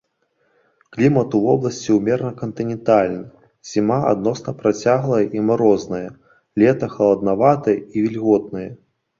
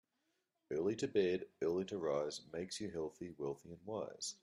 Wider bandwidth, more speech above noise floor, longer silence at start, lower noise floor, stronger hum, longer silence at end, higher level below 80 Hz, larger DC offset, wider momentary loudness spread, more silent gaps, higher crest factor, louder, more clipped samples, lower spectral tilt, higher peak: second, 7.6 kHz vs 12 kHz; about the same, 48 dB vs 45 dB; first, 0.95 s vs 0.7 s; second, -66 dBFS vs -85 dBFS; neither; first, 0.45 s vs 0.1 s; first, -54 dBFS vs -76 dBFS; neither; about the same, 12 LU vs 10 LU; neither; about the same, 16 dB vs 18 dB; first, -18 LUFS vs -41 LUFS; neither; first, -7.5 dB/octave vs -4.5 dB/octave; first, -2 dBFS vs -24 dBFS